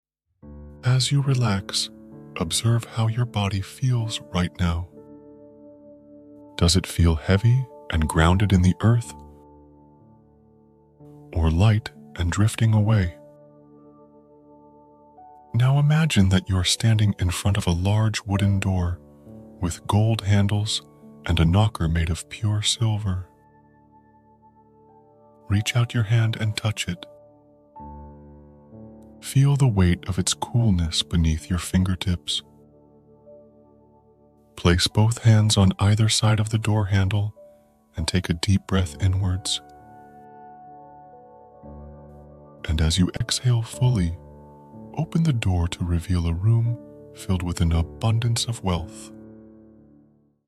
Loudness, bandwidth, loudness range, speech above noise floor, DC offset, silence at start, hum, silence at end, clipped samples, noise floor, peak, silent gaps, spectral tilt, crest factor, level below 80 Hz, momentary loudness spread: -22 LUFS; 14 kHz; 7 LU; 37 dB; under 0.1%; 0.45 s; none; 1.15 s; under 0.1%; -58 dBFS; -4 dBFS; none; -5.5 dB/octave; 18 dB; -40 dBFS; 13 LU